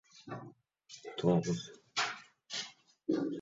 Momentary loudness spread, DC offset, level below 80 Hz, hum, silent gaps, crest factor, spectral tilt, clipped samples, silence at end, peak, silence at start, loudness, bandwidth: 18 LU; under 0.1%; -72 dBFS; none; none; 22 dB; -5 dB/octave; under 0.1%; 0 s; -16 dBFS; 0.15 s; -36 LUFS; 7.8 kHz